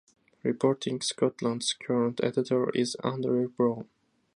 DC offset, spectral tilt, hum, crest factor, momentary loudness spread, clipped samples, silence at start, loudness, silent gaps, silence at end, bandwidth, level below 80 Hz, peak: under 0.1%; -5 dB/octave; none; 18 dB; 4 LU; under 0.1%; 0.45 s; -29 LUFS; none; 0.5 s; 11.5 kHz; -74 dBFS; -12 dBFS